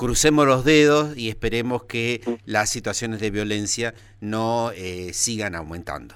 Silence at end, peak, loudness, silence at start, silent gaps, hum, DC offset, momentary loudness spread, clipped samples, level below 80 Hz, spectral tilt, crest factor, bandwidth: 0 s; -4 dBFS; -22 LUFS; 0 s; none; none; under 0.1%; 14 LU; under 0.1%; -40 dBFS; -4 dB/octave; 18 dB; 16.5 kHz